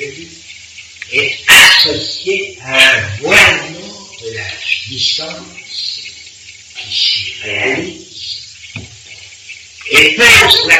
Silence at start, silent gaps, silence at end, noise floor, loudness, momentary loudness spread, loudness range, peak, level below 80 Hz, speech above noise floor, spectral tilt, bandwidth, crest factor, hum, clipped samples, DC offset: 0 s; none; 0 s; -36 dBFS; -9 LUFS; 25 LU; 10 LU; 0 dBFS; -42 dBFS; 24 dB; -1 dB/octave; 16 kHz; 14 dB; none; 0.1%; under 0.1%